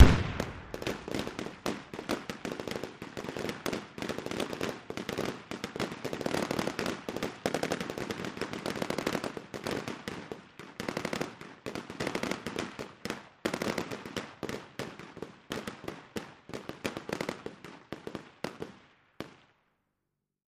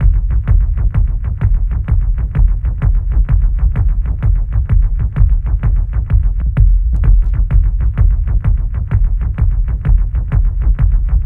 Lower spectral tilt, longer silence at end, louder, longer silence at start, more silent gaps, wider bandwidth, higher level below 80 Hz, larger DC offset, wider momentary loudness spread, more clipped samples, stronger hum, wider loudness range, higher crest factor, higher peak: second, -5.5 dB/octave vs -11 dB/octave; first, 1.15 s vs 0 s; second, -37 LUFS vs -16 LUFS; about the same, 0 s vs 0 s; neither; first, 15.5 kHz vs 2.7 kHz; second, -44 dBFS vs -12 dBFS; neither; first, 11 LU vs 3 LU; neither; neither; first, 6 LU vs 1 LU; first, 30 dB vs 12 dB; second, -4 dBFS vs 0 dBFS